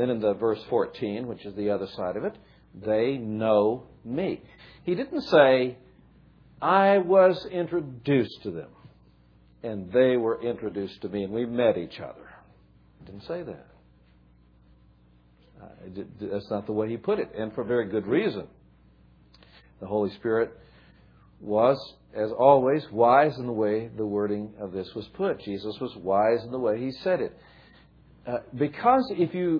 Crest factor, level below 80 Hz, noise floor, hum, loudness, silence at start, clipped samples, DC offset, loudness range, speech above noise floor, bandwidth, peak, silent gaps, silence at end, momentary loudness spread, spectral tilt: 22 dB; -60 dBFS; -58 dBFS; none; -26 LUFS; 0 s; under 0.1%; under 0.1%; 10 LU; 33 dB; 5.4 kHz; -4 dBFS; none; 0 s; 17 LU; -8.5 dB/octave